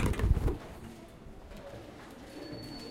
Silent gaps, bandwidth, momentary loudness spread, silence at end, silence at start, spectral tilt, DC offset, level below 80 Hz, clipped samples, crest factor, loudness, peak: none; 16.5 kHz; 19 LU; 0 s; 0 s; -6.5 dB/octave; under 0.1%; -38 dBFS; under 0.1%; 22 dB; -37 LUFS; -14 dBFS